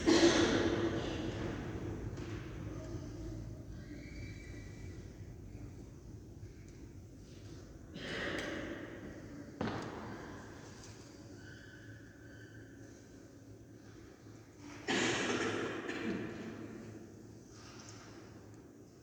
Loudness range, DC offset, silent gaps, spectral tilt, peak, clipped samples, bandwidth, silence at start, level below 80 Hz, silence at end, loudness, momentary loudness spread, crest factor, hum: 14 LU; under 0.1%; none; -4.5 dB/octave; -16 dBFS; under 0.1%; 19.5 kHz; 0 s; -56 dBFS; 0 s; -39 LUFS; 20 LU; 24 dB; none